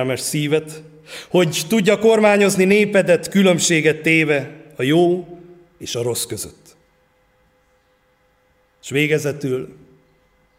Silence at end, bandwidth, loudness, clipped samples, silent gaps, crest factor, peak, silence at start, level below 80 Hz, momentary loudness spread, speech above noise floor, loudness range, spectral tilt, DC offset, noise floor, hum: 0.85 s; 16 kHz; -17 LUFS; under 0.1%; none; 16 dB; -2 dBFS; 0 s; -60 dBFS; 20 LU; 43 dB; 14 LU; -4.5 dB/octave; under 0.1%; -60 dBFS; none